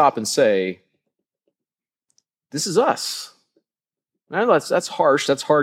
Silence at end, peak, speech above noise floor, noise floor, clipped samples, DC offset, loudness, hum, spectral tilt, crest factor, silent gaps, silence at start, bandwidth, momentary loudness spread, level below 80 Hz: 0 s; -2 dBFS; over 71 dB; under -90 dBFS; under 0.1%; under 0.1%; -20 LUFS; none; -3.5 dB/octave; 20 dB; none; 0 s; 16 kHz; 13 LU; -78 dBFS